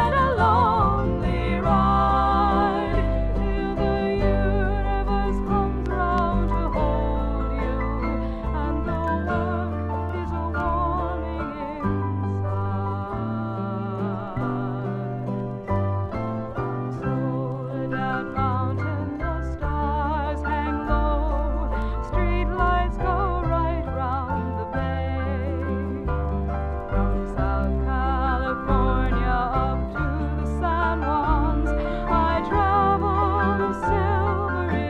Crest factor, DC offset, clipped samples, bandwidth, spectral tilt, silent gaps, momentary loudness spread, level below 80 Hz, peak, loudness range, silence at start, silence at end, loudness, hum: 16 dB; under 0.1%; under 0.1%; 5 kHz; -9 dB/octave; none; 8 LU; -28 dBFS; -6 dBFS; 5 LU; 0 s; 0 s; -24 LUFS; none